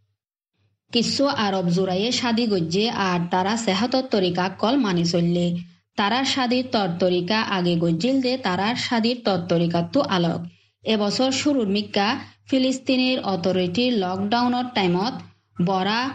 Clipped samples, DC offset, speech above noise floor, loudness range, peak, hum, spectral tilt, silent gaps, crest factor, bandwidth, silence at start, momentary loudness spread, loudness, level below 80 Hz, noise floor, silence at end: under 0.1%; under 0.1%; 56 dB; 1 LU; -6 dBFS; none; -5 dB/octave; none; 16 dB; 9.4 kHz; 0.95 s; 4 LU; -22 LUFS; -64 dBFS; -77 dBFS; 0 s